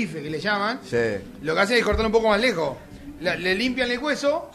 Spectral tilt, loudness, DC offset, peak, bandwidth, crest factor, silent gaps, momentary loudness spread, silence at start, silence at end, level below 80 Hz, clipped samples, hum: -4.5 dB/octave; -23 LUFS; under 0.1%; -6 dBFS; 14 kHz; 18 dB; none; 10 LU; 0 s; 0 s; -42 dBFS; under 0.1%; none